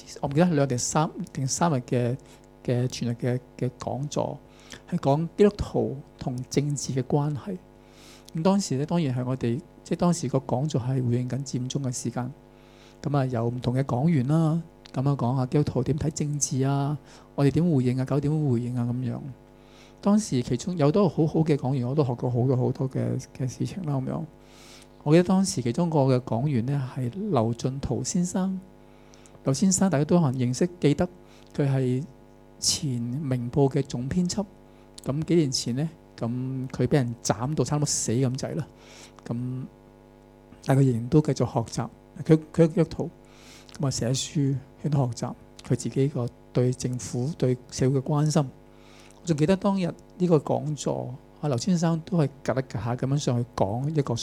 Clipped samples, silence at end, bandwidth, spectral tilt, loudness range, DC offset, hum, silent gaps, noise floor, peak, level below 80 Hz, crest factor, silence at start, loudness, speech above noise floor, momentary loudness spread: under 0.1%; 0 s; 13.5 kHz; -6 dB/octave; 3 LU; under 0.1%; none; none; -51 dBFS; -4 dBFS; -52 dBFS; 22 dB; 0 s; -26 LUFS; 26 dB; 11 LU